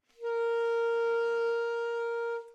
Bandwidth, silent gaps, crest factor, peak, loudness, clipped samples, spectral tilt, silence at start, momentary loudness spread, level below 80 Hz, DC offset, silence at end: 7.8 kHz; none; 8 dB; -24 dBFS; -31 LUFS; under 0.1%; 0 dB/octave; 0.2 s; 4 LU; -88 dBFS; under 0.1%; 0 s